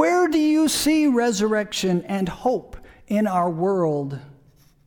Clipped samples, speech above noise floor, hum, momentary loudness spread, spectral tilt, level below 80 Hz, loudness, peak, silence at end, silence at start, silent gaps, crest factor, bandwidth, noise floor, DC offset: under 0.1%; 33 dB; none; 8 LU; -5 dB/octave; -50 dBFS; -21 LUFS; -4 dBFS; 0.55 s; 0 s; none; 16 dB; 19 kHz; -55 dBFS; under 0.1%